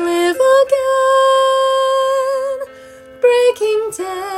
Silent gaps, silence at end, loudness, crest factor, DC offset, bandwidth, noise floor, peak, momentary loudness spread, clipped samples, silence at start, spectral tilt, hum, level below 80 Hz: none; 0 s; -14 LUFS; 12 dB; under 0.1%; 14.5 kHz; -38 dBFS; -2 dBFS; 11 LU; under 0.1%; 0 s; -2 dB/octave; none; -60 dBFS